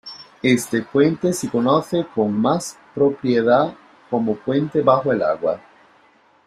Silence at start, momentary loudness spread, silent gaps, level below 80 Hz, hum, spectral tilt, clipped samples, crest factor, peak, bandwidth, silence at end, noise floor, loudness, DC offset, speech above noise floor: 0.05 s; 8 LU; none; -60 dBFS; none; -6 dB/octave; under 0.1%; 18 dB; -2 dBFS; 14.5 kHz; 0.9 s; -55 dBFS; -19 LUFS; under 0.1%; 36 dB